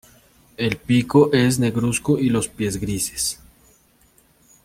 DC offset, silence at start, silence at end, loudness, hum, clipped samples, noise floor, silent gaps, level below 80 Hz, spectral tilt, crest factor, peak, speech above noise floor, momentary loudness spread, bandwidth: under 0.1%; 0.6 s; 1.3 s; -20 LUFS; none; under 0.1%; -57 dBFS; none; -48 dBFS; -5 dB/octave; 20 dB; -2 dBFS; 38 dB; 9 LU; 16.5 kHz